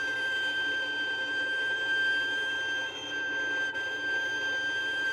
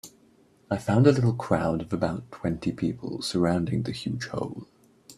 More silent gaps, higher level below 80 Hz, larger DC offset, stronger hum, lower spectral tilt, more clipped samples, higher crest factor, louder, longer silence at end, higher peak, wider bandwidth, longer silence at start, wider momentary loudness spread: neither; second, -72 dBFS vs -54 dBFS; neither; neither; second, -1 dB/octave vs -7 dB/octave; neither; second, 10 dB vs 22 dB; about the same, -29 LUFS vs -27 LUFS; about the same, 0 s vs 0.05 s; second, -20 dBFS vs -6 dBFS; about the same, 15 kHz vs 14 kHz; about the same, 0 s vs 0.05 s; second, 4 LU vs 12 LU